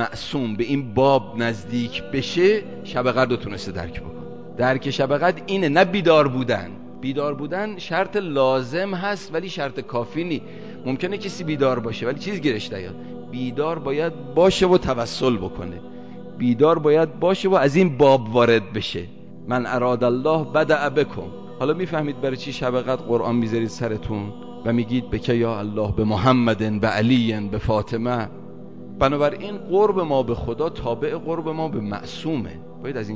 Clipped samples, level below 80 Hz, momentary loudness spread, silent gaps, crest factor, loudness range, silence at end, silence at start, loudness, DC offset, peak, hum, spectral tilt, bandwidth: under 0.1%; -44 dBFS; 14 LU; none; 18 dB; 6 LU; 0 s; 0 s; -22 LUFS; 0.9%; -4 dBFS; none; -6.5 dB/octave; 8 kHz